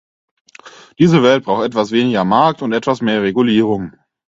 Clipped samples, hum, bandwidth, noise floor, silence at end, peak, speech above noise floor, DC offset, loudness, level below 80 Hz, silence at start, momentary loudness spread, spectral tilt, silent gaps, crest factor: under 0.1%; none; 7.8 kHz; -41 dBFS; 0.45 s; 0 dBFS; 27 dB; under 0.1%; -14 LUFS; -52 dBFS; 0.65 s; 7 LU; -6.5 dB/octave; none; 16 dB